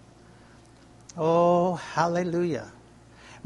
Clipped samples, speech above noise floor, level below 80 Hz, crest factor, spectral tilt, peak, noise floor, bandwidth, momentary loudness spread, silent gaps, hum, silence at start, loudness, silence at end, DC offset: under 0.1%; 28 dB; -62 dBFS; 20 dB; -6.5 dB/octave; -8 dBFS; -53 dBFS; 11.5 kHz; 16 LU; none; none; 1.15 s; -25 LUFS; 0.05 s; under 0.1%